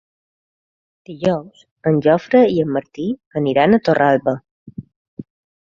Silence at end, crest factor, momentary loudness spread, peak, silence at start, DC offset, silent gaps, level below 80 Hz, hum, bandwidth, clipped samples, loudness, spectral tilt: 0.45 s; 16 dB; 23 LU; -2 dBFS; 1.1 s; under 0.1%; 1.71-1.76 s, 3.26-3.31 s, 4.51-4.66 s, 4.96-5.17 s; -56 dBFS; none; 7.4 kHz; under 0.1%; -17 LUFS; -8 dB/octave